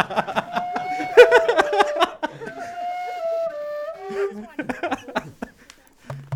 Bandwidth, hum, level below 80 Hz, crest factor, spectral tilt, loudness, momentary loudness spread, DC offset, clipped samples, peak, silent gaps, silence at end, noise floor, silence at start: 15 kHz; none; -58 dBFS; 22 dB; -4 dB/octave; -21 LUFS; 20 LU; under 0.1%; under 0.1%; 0 dBFS; none; 0 s; -50 dBFS; 0 s